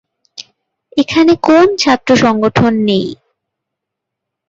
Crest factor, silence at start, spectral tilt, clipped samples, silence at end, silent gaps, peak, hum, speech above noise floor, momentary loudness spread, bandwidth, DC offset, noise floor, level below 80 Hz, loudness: 14 dB; 0.4 s; -5.5 dB/octave; under 0.1%; 1.35 s; none; 0 dBFS; none; 68 dB; 18 LU; 7.8 kHz; under 0.1%; -78 dBFS; -46 dBFS; -11 LUFS